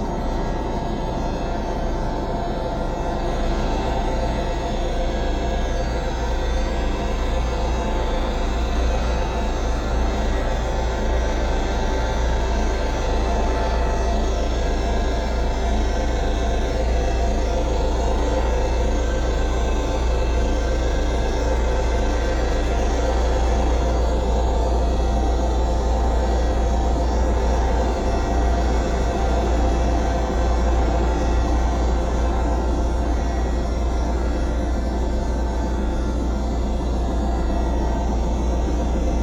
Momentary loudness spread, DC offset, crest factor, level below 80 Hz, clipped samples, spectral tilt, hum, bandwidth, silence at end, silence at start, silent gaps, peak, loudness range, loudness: 4 LU; under 0.1%; 12 dB; -22 dBFS; under 0.1%; -6 dB/octave; none; 8.4 kHz; 0 s; 0 s; none; -8 dBFS; 3 LU; -23 LUFS